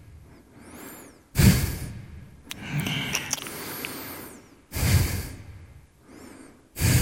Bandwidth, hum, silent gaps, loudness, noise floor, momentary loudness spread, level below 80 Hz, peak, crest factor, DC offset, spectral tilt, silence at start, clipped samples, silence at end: 17 kHz; none; none; -26 LUFS; -50 dBFS; 26 LU; -36 dBFS; -4 dBFS; 24 dB; under 0.1%; -4.5 dB/octave; 0.1 s; under 0.1%; 0 s